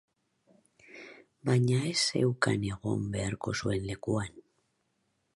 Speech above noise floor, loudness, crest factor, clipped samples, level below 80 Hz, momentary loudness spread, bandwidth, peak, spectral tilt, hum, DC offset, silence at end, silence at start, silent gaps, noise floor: 47 dB; -30 LUFS; 20 dB; under 0.1%; -56 dBFS; 18 LU; 11.5 kHz; -12 dBFS; -5 dB/octave; none; under 0.1%; 0.95 s; 0.9 s; none; -77 dBFS